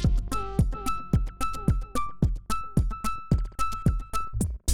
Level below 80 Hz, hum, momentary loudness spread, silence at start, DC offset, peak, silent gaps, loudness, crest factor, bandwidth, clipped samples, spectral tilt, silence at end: -30 dBFS; none; 5 LU; 0 s; 1%; -10 dBFS; none; -29 LUFS; 16 dB; 17 kHz; under 0.1%; -6 dB/octave; 0 s